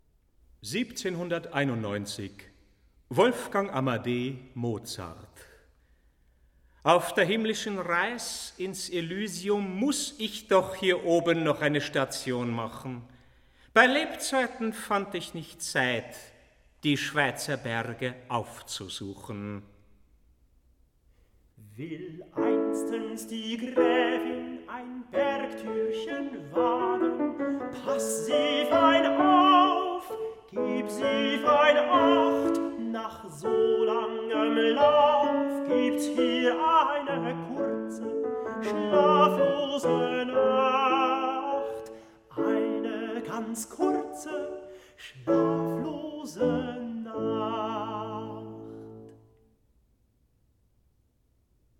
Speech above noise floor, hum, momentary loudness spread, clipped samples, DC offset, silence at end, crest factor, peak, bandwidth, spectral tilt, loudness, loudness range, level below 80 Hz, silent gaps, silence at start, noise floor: 42 dB; none; 17 LU; under 0.1%; under 0.1%; 2.65 s; 24 dB; -4 dBFS; 17 kHz; -4.5 dB/octave; -27 LUFS; 10 LU; -64 dBFS; none; 0.6 s; -69 dBFS